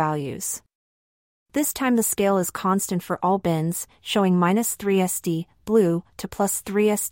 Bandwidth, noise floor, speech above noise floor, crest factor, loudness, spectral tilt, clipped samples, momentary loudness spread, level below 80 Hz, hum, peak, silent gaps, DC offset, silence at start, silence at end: 16.5 kHz; under -90 dBFS; over 68 dB; 16 dB; -23 LUFS; -5 dB/octave; under 0.1%; 9 LU; -58 dBFS; none; -6 dBFS; 0.75-1.46 s; under 0.1%; 0 s; 0 s